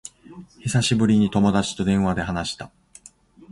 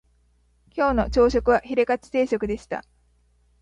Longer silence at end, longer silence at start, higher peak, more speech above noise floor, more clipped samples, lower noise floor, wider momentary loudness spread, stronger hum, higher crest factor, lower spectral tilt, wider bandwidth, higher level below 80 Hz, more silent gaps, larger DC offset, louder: about the same, 0.85 s vs 0.8 s; second, 0.3 s vs 0.75 s; about the same, -6 dBFS vs -6 dBFS; second, 30 dB vs 41 dB; neither; second, -50 dBFS vs -62 dBFS; about the same, 16 LU vs 14 LU; second, none vs 60 Hz at -45 dBFS; about the same, 16 dB vs 18 dB; about the same, -5.5 dB/octave vs -6 dB/octave; first, 11.5 kHz vs 9.4 kHz; about the same, -44 dBFS vs -40 dBFS; neither; neither; about the same, -21 LUFS vs -23 LUFS